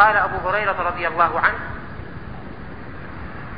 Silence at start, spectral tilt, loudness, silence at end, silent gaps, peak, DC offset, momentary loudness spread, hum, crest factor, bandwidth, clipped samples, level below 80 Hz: 0 s; -10 dB/octave; -20 LUFS; 0 s; none; -2 dBFS; 1%; 18 LU; none; 20 dB; 5.2 kHz; under 0.1%; -42 dBFS